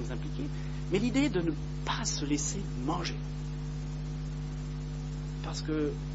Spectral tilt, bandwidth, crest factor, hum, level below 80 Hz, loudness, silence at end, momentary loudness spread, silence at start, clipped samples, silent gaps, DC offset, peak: -5 dB/octave; 8 kHz; 18 dB; 50 Hz at -35 dBFS; -40 dBFS; -34 LUFS; 0 s; 9 LU; 0 s; under 0.1%; none; under 0.1%; -16 dBFS